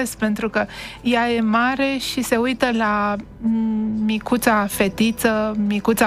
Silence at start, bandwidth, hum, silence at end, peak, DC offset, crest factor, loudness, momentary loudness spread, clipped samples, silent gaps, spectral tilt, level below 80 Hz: 0 s; 16 kHz; none; 0 s; -2 dBFS; under 0.1%; 16 dB; -20 LUFS; 5 LU; under 0.1%; none; -4.5 dB/octave; -46 dBFS